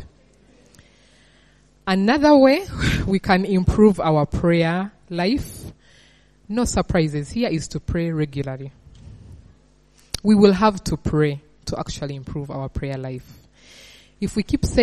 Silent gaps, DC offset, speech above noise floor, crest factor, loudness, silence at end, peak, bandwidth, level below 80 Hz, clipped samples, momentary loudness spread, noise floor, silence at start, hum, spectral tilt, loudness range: none; under 0.1%; 36 dB; 20 dB; -20 LUFS; 0 s; 0 dBFS; 13.5 kHz; -38 dBFS; under 0.1%; 16 LU; -55 dBFS; 0 s; none; -6 dB/octave; 9 LU